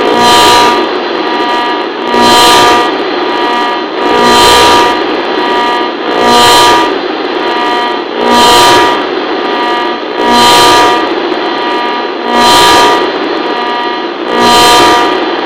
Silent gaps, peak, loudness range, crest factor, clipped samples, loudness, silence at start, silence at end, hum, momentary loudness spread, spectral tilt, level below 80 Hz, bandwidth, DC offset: none; 0 dBFS; 2 LU; 8 dB; 2%; -7 LUFS; 0 s; 0 s; none; 9 LU; -2 dB/octave; -38 dBFS; over 20 kHz; 0.5%